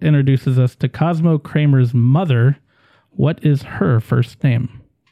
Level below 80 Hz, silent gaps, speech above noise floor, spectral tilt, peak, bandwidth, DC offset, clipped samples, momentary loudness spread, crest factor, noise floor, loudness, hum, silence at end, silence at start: -50 dBFS; none; 41 dB; -9.5 dB/octave; -4 dBFS; 5.6 kHz; under 0.1%; under 0.1%; 5 LU; 12 dB; -56 dBFS; -16 LUFS; none; 0.35 s; 0 s